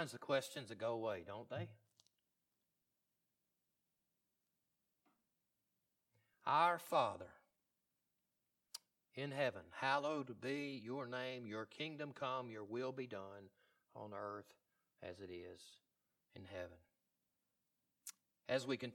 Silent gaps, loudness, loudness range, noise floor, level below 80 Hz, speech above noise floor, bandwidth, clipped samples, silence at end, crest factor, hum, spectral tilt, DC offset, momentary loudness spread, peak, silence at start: none; -44 LUFS; 15 LU; -89 dBFS; -88 dBFS; 45 dB; 19 kHz; under 0.1%; 0 s; 24 dB; none; -4.5 dB/octave; under 0.1%; 18 LU; -22 dBFS; 0 s